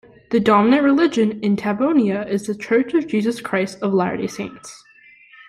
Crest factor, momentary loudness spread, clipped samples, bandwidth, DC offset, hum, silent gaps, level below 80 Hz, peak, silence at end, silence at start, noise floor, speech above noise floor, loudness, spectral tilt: 16 dB; 12 LU; under 0.1%; 12.5 kHz; under 0.1%; none; none; -58 dBFS; -4 dBFS; 0.75 s; 0.3 s; -48 dBFS; 30 dB; -19 LUFS; -6.5 dB/octave